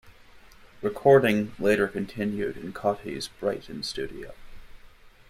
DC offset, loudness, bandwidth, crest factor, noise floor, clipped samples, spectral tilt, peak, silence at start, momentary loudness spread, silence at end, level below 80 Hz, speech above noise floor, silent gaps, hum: under 0.1%; -26 LUFS; 15.5 kHz; 22 dB; -51 dBFS; under 0.1%; -5.5 dB/octave; -6 dBFS; 0.05 s; 15 LU; 0.2 s; -52 dBFS; 26 dB; none; none